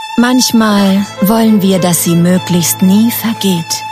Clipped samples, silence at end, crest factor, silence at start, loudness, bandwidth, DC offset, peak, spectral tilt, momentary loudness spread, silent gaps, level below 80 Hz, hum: under 0.1%; 0 s; 10 dB; 0 s; -10 LUFS; 15.5 kHz; under 0.1%; 0 dBFS; -4.5 dB/octave; 4 LU; none; -48 dBFS; none